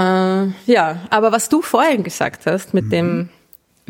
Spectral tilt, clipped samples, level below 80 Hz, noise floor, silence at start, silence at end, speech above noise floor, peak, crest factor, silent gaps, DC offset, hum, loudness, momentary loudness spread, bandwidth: -5 dB/octave; under 0.1%; -60 dBFS; -51 dBFS; 0 s; 0.6 s; 34 dB; -2 dBFS; 16 dB; none; under 0.1%; none; -17 LUFS; 6 LU; 17 kHz